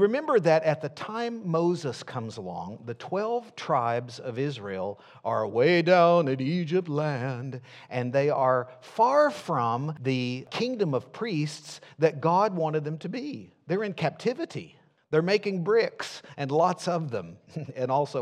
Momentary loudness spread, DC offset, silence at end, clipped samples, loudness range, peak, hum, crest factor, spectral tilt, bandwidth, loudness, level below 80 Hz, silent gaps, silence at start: 14 LU; under 0.1%; 0 s; under 0.1%; 5 LU; -6 dBFS; none; 20 dB; -6.5 dB/octave; 11.5 kHz; -27 LUFS; -78 dBFS; none; 0 s